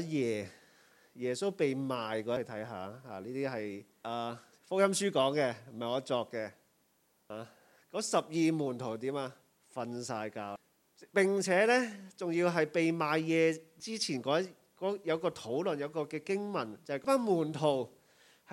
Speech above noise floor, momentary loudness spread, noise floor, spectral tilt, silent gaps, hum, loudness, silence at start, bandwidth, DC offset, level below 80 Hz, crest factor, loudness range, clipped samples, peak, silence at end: 40 dB; 14 LU; -73 dBFS; -4.5 dB/octave; none; none; -33 LUFS; 0 s; 16.5 kHz; under 0.1%; -84 dBFS; 20 dB; 6 LU; under 0.1%; -14 dBFS; 0 s